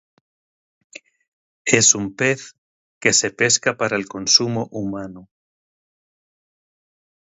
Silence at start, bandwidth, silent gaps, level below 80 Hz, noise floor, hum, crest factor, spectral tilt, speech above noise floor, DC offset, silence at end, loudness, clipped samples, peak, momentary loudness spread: 1.65 s; 16 kHz; 2.58-3.01 s; -60 dBFS; under -90 dBFS; none; 24 dB; -2 dB/octave; over 71 dB; under 0.1%; 2.15 s; -18 LUFS; under 0.1%; 0 dBFS; 13 LU